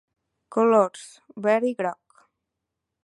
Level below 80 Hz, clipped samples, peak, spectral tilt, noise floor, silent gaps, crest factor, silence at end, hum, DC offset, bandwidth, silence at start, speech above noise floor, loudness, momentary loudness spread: -80 dBFS; under 0.1%; -6 dBFS; -6 dB/octave; -83 dBFS; none; 20 dB; 1.1 s; none; under 0.1%; 11.5 kHz; 0.5 s; 61 dB; -23 LUFS; 16 LU